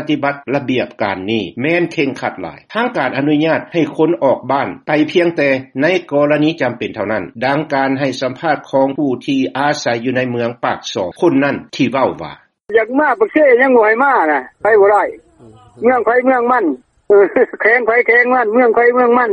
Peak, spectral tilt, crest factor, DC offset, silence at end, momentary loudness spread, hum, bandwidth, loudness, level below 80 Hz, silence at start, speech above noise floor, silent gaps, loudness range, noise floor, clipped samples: 0 dBFS; -6 dB/octave; 14 dB; under 0.1%; 0 s; 9 LU; none; 11 kHz; -14 LUFS; -58 dBFS; 0 s; 29 dB; none; 5 LU; -43 dBFS; under 0.1%